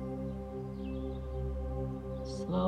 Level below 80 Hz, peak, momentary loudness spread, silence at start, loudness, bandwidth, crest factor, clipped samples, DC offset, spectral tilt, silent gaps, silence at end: -42 dBFS; -18 dBFS; 3 LU; 0 s; -39 LUFS; 9.4 kHz; 18 dB; under 0.1%; under 0.1%; -8 dB/octave; none; 0 s